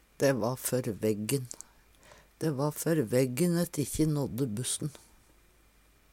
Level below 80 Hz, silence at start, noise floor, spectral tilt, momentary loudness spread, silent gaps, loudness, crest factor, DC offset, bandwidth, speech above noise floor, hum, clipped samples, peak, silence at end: -58 dBFS; 0.2 s; -63 dBFS; -5.5 dB/octave; 7 LU; none; -31 LUFS; 18 dB; under 0.1%; 18 kHz; 33 dB; none; under 0.1%; -14 dBFS; 1.15 s